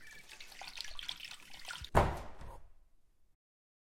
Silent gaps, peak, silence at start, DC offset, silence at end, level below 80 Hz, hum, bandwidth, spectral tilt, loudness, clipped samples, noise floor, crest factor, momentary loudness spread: none; -10 dBFS; 0 s; under 0.1%; 0.7 s; -48 dBFS; none; 16.5 kHz; -4.5 dB/octave; -39 LUFS; under 0.1%; -65 dBFS; 30 dB; 21 LU